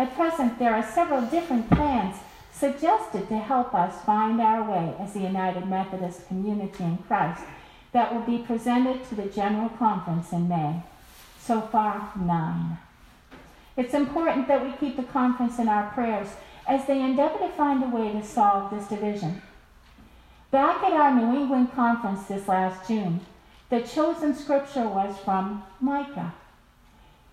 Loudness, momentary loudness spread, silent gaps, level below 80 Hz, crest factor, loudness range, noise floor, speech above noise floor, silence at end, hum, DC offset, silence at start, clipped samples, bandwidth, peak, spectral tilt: -26 LUFS; 9 LU; none; -50 dBFS; 20 dB; 4 LU; -56 dBFS; 31 dB; 0.95 s; none; under 0.1%; 0 s; under 0.1%; 14 kHz; -4 dBFS; -7 dB/octave